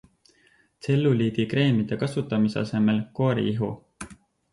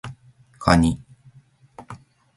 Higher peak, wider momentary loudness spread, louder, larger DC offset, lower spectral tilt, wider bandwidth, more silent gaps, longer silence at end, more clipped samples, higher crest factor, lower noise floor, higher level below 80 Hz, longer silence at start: second, -10 dBFS vs -2 dBFS; second, 16 LU vs 25 LU; second, -24 LUFS vs -20 LUFS; neither; first, -7.5 dB/octave vs -6 dB/octave; about the same, 11.5 kHz vs 11.5 kHz; neither; about the same, 0.4 s vs 0.4 s; neither; second, 14 dB vs 24 dB; first, -62 dBFS vs -53 dBFS; second, -58 dBFS vs -38 dBFS; first, 0.85 s vs 0.05 s